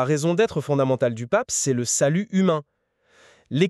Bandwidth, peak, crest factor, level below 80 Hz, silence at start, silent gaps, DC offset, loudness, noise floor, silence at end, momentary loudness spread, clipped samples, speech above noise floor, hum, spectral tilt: 13.5 kHz; -4 dBFS; 18 dB; -62 dBFS; 0 s; none; under 0.1%; -22 LUFS; -60 dBFS; 0 s; 3 LU; under 0.1%; 39 dB; none; -5 dB/octave